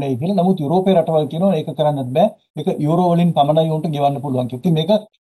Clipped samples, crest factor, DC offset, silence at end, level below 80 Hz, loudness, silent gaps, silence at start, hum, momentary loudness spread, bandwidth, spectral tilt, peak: under 0.1%; 14 dB; under 0.1%; 0.2 s; -60 dBFS; -17 LUFS; 2.50-2.54 s; 0 s; none; 5 LU; 12.5 kHz; -8.5 dB/octave; -4 dBFS